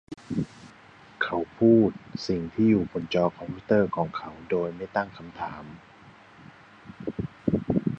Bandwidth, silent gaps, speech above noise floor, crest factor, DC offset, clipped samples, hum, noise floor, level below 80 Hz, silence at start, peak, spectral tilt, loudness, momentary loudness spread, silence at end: 7.6 kHz; none; 26 dB; 20 dB; under 0.1%; under 0.1%; none; -51 dBFS; -54 dBFS; 0.1 s; -8 dBFS; -8 dB/octave; -27 LUFS; 15 LU; 0 s